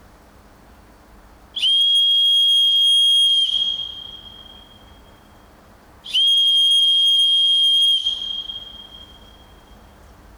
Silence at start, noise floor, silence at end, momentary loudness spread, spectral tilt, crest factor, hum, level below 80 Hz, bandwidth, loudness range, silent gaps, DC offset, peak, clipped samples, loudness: 1.55 s; -48 dBFS; 1.35 s; 18 LU; 1 dB/octave; 8 dB; none; -52 dBFS; over 20 kHz; 5 LU; none; under 0.1%; -10 dBFS; under 0.1%; -13 LUFS